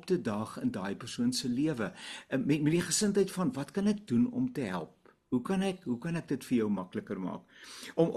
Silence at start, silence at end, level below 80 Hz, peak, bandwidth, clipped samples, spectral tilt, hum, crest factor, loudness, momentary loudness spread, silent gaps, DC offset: 0.05 s; 0 s; -64 dBFS; -14 dBFS; 13 kHz; under 0.1%; -5 dB/octave; none; 18 dB; -32 LUFS; 10 LU; none; under 0.1%